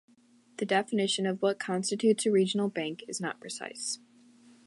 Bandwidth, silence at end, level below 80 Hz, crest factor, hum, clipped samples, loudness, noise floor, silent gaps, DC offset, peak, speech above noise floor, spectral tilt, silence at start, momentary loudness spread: 11.5 kHz; 0.7 s; -82 dBFS; 18 dB; none; under 0.1%; -30 LUFS; -62 dBFS; none; under 0.1%; -14 dBFS; 33 dB; -4 dB/octave; 0.6 s; 12 LU